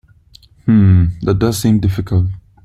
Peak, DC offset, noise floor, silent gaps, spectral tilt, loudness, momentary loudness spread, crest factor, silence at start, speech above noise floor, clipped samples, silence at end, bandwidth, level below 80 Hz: 0 dBFS; under 0.1%; -46 dBFS; none; -7.5 dB/octave; -14 LUFS; 8 LU; 14 dB; 0.65 s; 34 dB; under 0.1%; 0.25 s; 15 kHz; -34 dBFS